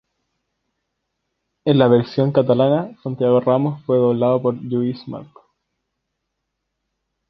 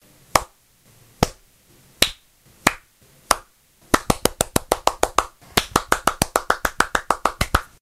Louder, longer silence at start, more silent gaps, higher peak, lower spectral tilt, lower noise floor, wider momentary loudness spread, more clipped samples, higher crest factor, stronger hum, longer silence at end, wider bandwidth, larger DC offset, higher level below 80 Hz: first, -18 LUFS vs -22 LUFS; first, 1.65 s vs 0.35 s; neither; about the same, -2 dBFS vs 0 dBFS; first, -10 dB/octave vs -2.5 dB/octave; first, -77 dBFS vs -55 dBFS; first, 11 LU vs 4 LU; neither; second, 18 dB vs 24 dB; neither; first, 2.05 s vs 0.2 s; second, 6 kHz vs over 20 kHz; neither; second, -62 dBFS vs -38 dBFS